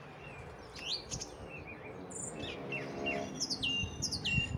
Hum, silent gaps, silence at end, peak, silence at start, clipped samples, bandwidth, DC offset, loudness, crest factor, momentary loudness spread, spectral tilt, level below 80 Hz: none; none; 0 s; -18 dBFS; 0 s; under 0.1%; 17 kHz; under 0.1%; -37 LUFS; 22 dB; 15 LU; -3 dB/octave; -56 dBFS